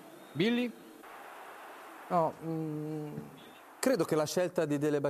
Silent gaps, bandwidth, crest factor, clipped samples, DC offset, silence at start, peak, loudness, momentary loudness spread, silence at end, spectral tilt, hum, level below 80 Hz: none; 14.5 kHz; 20 dB; under 0.1%; under 0.1%; 0 s; -14 dBFS; -33 LUFS; 19 LU; 0 s; -5.5 dB/octave; none; -78 dBFS